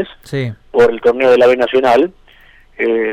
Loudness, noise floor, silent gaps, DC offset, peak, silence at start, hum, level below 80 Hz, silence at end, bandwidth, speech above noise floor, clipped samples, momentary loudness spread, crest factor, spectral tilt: -13 LUFS; -45 dBFS; none; under 0.1%; -4 dBFS; 0 s; none; -46 dBFS; 0 s; 10 kHz; 32 dB; under 0.1%; 12 LU; 10 dB; -6.5 dB/octave